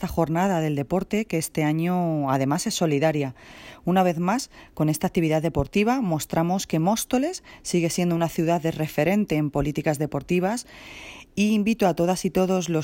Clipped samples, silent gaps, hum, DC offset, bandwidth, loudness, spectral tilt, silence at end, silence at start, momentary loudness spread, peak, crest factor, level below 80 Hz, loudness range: under 0.1%; none; none; under 0.1%; 16.5 kHz; -24 LUFS; -5.5 dB/octave; 0 s; 0 s; 7 LU; -8 dBFS; 16 dB; -48 dBFS; 1 LU